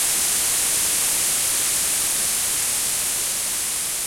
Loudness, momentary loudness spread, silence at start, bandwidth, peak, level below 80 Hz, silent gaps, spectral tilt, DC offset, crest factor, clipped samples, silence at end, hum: -19 LUFS; 3 LU; 0 s; 16.5 kHz; -8 dBFS; -52 dBFS; none; 1 dB/octave; under 0.1%; 14 dB; under 0.1%; 0 s; none